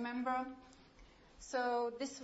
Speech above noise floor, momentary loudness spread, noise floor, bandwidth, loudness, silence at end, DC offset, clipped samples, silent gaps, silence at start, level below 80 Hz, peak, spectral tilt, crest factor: 23 dB; 17 LU; -62 dBFS; 7.6 kHz; -39 LUFS; 0 s; under 0.1%; under 0.1%; none; 0 s; -68 dBFS; -26 dBFS; -1.5 dB/octave; 16 dB